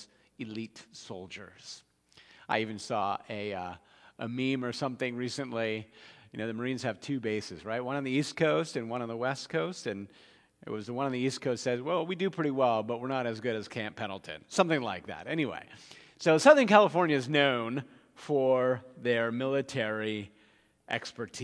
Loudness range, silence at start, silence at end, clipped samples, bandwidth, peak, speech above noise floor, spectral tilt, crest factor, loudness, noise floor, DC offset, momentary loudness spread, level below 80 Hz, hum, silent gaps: 10 LU; 0 s; 0 s; under 0.1%; 11 kHz; -6 dBFS; 34 dB; -5 dB/octave; 26 dB; -30 LUFS; -65 dBFS; under 0.1%; 18 LU; -76 dBFS; none; none